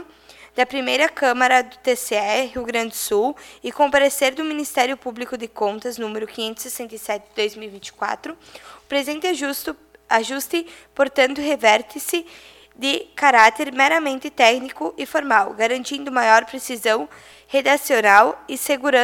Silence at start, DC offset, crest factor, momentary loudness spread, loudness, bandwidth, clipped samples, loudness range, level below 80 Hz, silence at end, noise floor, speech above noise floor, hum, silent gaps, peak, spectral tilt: 0 s; under 0.1%; 20 dB; 14 LU; -19 LUFS; 19 kHz; under 0.1%; 9 LU; -60 dBFS; 0 s; -47 dBFS; 27 dB; none; none; 0 dBFS; -1.5 dB/octave